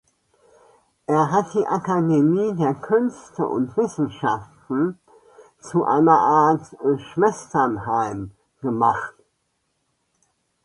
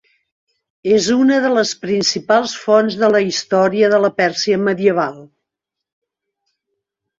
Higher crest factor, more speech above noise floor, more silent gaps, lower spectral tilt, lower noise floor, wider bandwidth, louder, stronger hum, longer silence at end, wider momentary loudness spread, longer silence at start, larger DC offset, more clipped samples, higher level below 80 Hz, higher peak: about the same, 18 dB vs 16 dB; second, 52 dB vs 67 dB; neither; first, -7.5 dB/octave vs -4 dB/octave; second, -72 dBFS vs -82 dBFS; first, 11 kHz vs 7.8 kHz; second, -21 LUFS vs -15 LUFS; neither; second, 1.55 s vs 1.95 s; first, 11 LU vs 4 LU; first, 1.1 s vs 0.85 s; neither; neither; about the same, -60 dBFS vs -62 dBFS; second, -4 dBFS vs 0 dBFS